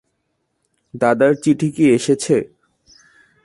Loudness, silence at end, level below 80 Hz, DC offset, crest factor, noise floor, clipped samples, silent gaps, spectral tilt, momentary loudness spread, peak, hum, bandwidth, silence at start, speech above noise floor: -16 LUFS; 1 s; -60 dBFS; under 0.1%; 18 dB; -71 dBFS; under 0.1%; none; -6 dB/octave; 5 LU; -2 dBFS; none; 11.5 kHz; 0.95 s; 55 dB